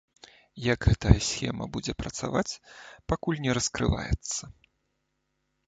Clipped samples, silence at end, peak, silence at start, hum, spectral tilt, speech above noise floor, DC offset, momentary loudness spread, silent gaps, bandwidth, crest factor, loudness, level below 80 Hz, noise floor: under 0.1%; 1.15 s; -2 dBFS; 0.55 s; none; -5 dB/octave; 50 dB; under 0.1%; 12 LU; none; 9.2 kHz; 26 dB; -28 LUFS; -38 dBFS; -78 dBFS